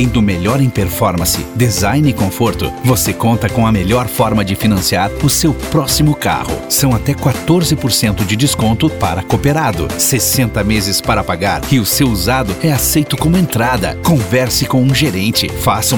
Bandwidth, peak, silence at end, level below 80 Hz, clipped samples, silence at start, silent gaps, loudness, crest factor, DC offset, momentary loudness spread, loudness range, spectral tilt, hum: over 20 kHz; 0 dBFS; 0 s; -28 dBFS; under 0.1%; 0 s; none; -13 LUFS; 12 dB; 0.5%; 3 LU; 1 LU; -4.5 dB/octave; none